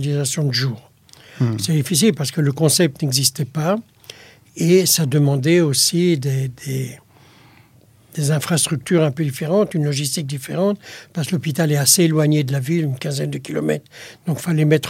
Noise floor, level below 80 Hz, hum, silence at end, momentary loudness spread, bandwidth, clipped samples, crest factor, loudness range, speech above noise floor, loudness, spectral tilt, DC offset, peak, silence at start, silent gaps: -51 dBFS; -60 dBFS; none; 0 s; 12 LU; 16.5 kHz; under 0.1%; 18 dB; 3 LU; 33 dB; -18 LUFS; -4.5 dB/octave; under 0.1%; 0 dBFS; 0 s; none